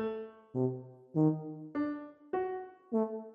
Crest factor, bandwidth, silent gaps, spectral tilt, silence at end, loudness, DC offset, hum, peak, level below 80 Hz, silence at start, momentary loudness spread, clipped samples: 18 dB; 4.9 kHz; none; -11 dB/octave; 0 s; -36 LUFS; under 0.1%; none; -18 dBFS; -76 dBFS; 0 s; 13 LU; under 0.1%